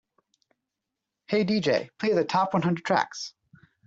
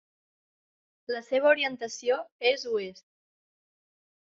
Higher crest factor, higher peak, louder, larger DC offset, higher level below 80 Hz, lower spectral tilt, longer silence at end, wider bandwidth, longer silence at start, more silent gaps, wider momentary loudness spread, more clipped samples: about the same, 18 dB vs 22 dB; about the same, -10 dBFS vs -8 dBFS; about the same, -26 LUFS vs -28 LUFS; neither; first, -68 dBFS vs -80 dBFS; first, -5.5 dB/octave vs 0.5 dB/octave; second, 0.55 s vs 1.35 s; about the same, 7.8 kHz vs 7.6 kHz; first, 1.3 s vs 1.1 s; second, none vs 2.32-2.39 s; second, 8 LU vs 12 LU; neither